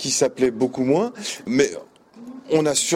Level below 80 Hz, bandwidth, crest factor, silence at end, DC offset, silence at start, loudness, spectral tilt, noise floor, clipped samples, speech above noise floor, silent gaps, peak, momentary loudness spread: -60 dBFS; 16 kHz; 18 dB; 0 s; under 0.1%; 0 s; -21 LUFS; -3.5 dB/octave; -41 dBFS; under 0.1%; 20 dB; none; -4 dBFS; 16 LU